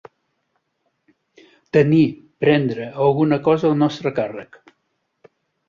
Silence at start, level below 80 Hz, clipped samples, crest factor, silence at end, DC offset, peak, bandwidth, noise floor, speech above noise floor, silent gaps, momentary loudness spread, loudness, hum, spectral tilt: 1.75 s; -60 dBFS; under 0.1%; 18 dB; 1.25 s; under 0.1%; -2 dBFS; 7.2 kHz; -72 dBFS; 54 dB; none; 9 LU; -18 LUFS; none; -8.5 dB/octave